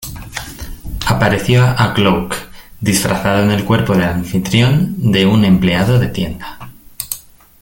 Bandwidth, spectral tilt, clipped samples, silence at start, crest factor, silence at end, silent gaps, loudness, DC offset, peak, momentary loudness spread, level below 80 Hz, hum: 17 kHz; -5.5 dB/octave; under 0.1%; 0 s; 14 dB; 0.4 s; none; -14 LUFS; under 0.1%; 0 dBFS; 15 LU; -34 dBFS; none